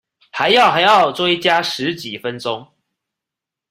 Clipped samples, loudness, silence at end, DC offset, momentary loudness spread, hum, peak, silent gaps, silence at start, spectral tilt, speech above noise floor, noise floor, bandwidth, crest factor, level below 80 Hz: under 0.1%; -15 LUFS; 1.05 s; under 0.1%; 14 LU; none; 0 dBFS; none; 0.35 s; -3.5 dB/octave; 69 dB; -85 dBFS; 16 kHz; 16 dB; -62 dBFS